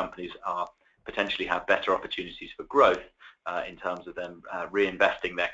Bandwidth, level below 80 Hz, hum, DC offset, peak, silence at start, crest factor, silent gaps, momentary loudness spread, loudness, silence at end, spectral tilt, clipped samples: 7.8 kHz; -60 dBFS; none; under 0.1%; -6 dBFS; 0 s; 22 dB; none; 16 LU; -28 LUFS; 0 s; -4.5 dB/octave; under 0.1%